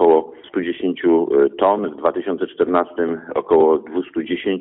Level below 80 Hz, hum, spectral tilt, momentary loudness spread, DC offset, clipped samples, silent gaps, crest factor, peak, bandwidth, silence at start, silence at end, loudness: -58 dBFS; none; -4.5 dB/octave; 9 LU; under 0.1%; under 0.1%; none; 14 dB; -4 dBFS; 4 kHz; 0 s; 0 s; -19 LUFS